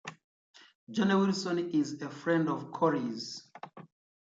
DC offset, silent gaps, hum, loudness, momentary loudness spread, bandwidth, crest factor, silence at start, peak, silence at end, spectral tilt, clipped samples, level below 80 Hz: under 0.1%; 0.24-0.54 s, 0.75-0.87 s; none; -31 LUFS; 19 LU; 8 kHz; 18 dB; 0.05 s; -16 dBFS; 0.4 s; -6 dB/octave; under 0.1%; -78 dBFS